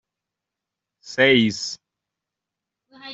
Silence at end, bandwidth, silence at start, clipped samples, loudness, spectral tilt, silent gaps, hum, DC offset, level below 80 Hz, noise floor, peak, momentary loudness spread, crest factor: 0 s; 8 kHz; 1.05 s; under 0.1%; -18 LUFS; -4 dB/octave; none; none; under 0.1%; -64 dBFS; -85 dBFS; -4 dBFS; 17 LU; 22 dB